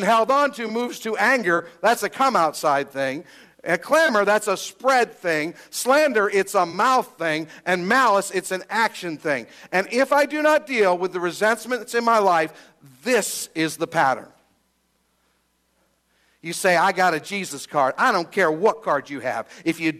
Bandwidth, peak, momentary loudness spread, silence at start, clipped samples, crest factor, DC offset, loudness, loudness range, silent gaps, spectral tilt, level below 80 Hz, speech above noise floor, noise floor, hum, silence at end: 15 kHz; -6 dBFS; 9 LU; 0 s; under 0.1%; 16 dB; under 0.1%; -21 LUFS; 5 LU; none; -3.5 dB/octave; -72 dBFS; 46 dB; -68 dBFS; none; 0 s